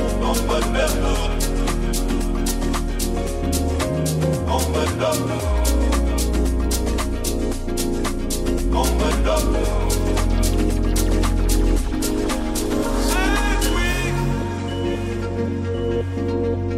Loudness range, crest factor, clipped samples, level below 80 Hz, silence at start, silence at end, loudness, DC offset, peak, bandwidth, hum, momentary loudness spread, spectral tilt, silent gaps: 2 LU; 14 dB; under 0.1%; -22 dBFS; 0 s; 0 s; -22 LUFS; under 0.1%; -6 dBFS; 16 kHz; none; 4 LU; -5 dB/octave; none